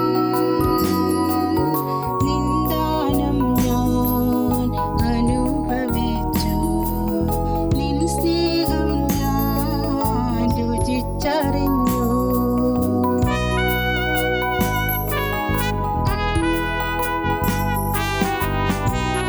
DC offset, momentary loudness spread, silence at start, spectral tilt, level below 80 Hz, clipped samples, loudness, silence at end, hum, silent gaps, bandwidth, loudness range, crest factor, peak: under 0.1%; 3 LU; 0 s; -6 dB/octave; -28 dBFS; under 0.1%; -20 LUFS; 0 s; none; none; over 20 kHz; 1 LU; 12 dB; -6 dBFS